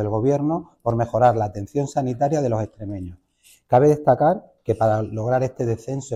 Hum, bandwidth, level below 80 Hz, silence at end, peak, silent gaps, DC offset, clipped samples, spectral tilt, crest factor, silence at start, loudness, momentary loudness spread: none; 13 kHz; -48 dBFS; 0 s; -4 dBFS; none; under 0.1%; under 0.1%; -8 dB/octave; 16 dB; 0 s; -21 LUFS; 10 LU